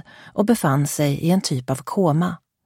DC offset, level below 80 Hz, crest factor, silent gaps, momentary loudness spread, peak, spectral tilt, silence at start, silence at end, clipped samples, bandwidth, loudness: under 0.1%; -56 dBFS; 14 dB; none; 7 LU; -6 dBFS; -6 dB/octave; 0.25 s; 0.3 s; under 0.1%; 16.5 kHz; -21 LUFS